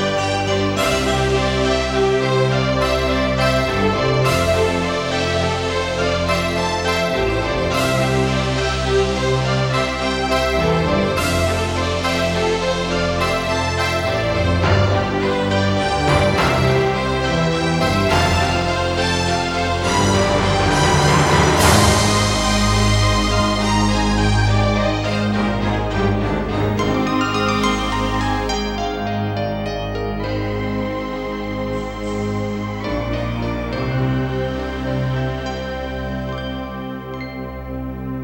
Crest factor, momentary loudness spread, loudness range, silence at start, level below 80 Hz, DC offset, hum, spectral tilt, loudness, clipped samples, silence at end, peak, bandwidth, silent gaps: 18 dB; 8 LU; 8 LU; 0 s; -30 dBFS; under 0.1%; none; -5 dB/octave; -18 LUFS; under 0.1%; 0 s; 0 dBFS; 16.5 kHz; none